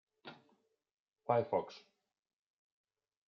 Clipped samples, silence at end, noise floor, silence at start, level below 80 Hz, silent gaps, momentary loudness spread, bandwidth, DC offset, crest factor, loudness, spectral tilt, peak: under 0.1%; 1.55 s; -76 dBFS; 0.25 s; under -90 dBFS; 0.91-1.06 s; 22 LU; 6.8 kHz; under 0.1%; 24 dB; -36 LUFS; -5.5 dB/octave; -18 dBFS